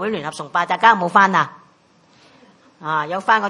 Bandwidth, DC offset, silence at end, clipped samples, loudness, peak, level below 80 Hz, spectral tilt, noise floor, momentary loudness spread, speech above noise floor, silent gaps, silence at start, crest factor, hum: 11 kHz; under 0.1%; 0 s; under 0.1%; -17 LUFS; 0 dBFS; -70 dBFS; -4.5 dB/octave; -54 dBFS; 12 LU; 37 dB; none; 0 s; 20 dB; none